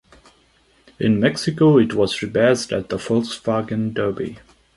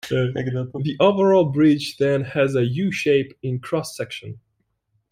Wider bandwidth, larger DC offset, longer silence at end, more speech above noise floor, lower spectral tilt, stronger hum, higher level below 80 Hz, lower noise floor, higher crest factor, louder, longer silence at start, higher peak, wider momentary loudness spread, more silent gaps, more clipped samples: second, 11.5 kHz vs 15.5 kHz; neither; second, 0.4 s vs 0.75 s; second, 39 dB vs 51 dB; about the same, -6 dB/octave vs -6.5 dB/octave; neither; first, -52 dBFS vs -58 dBFS; second, -57 dBFS vs -71 dBFS; about the same, 18 dB vs 18 dB; about the same, -19 LUFS vs -21 LUFS; first, 1 s vs 0.05 s; about the same, -2 dBFS vs -2 dBFS; second, 9 LU vs 13 LU; neither; neither